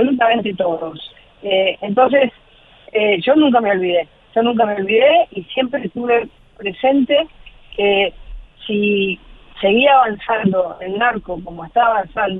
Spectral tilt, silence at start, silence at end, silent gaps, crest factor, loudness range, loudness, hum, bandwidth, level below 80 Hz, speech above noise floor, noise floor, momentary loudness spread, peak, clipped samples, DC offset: -8.5 dB/octave; 0 s; 0 s; none; 16 dB; 3 LU; -16 LUFS; none; 4.1 kHz; -46 dBFS; 29 dB; -45 dBFS; 14 LU; 0 dBFS; under 0.1%; under 0.1%